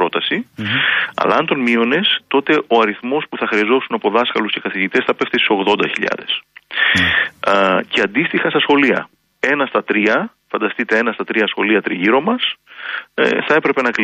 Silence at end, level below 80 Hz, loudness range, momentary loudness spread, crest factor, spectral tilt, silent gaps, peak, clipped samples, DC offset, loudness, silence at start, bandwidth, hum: 0 s; -56 dBFS; 2 LU; 7 LU; 14 dB; -5 dB/octave; none; -2 dBFS; under 0.1%; under 0.1%; -16 LUFS; 0 s; 12 kHz; none